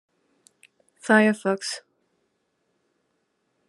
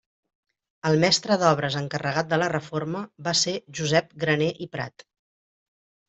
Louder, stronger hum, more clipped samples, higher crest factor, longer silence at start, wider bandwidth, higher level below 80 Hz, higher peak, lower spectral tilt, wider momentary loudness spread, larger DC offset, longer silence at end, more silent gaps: about the same, -22 LUFS vs -24 LUFS; neither; neither; about the same, 24 dB vs 22 dB; first, 1.05 s vs 0.85 s; first, 12 kHz vs 8.2 kHz; second, -86 dBFS vs -64 dBFS; about the same, -4 dBFS vs -4 dBFS; about the same, -4.5 dB/octave vs -4 dB/octave; first, 18 LU vs 12 LU; neither; first, 1.9 s vs 1.2 s; neither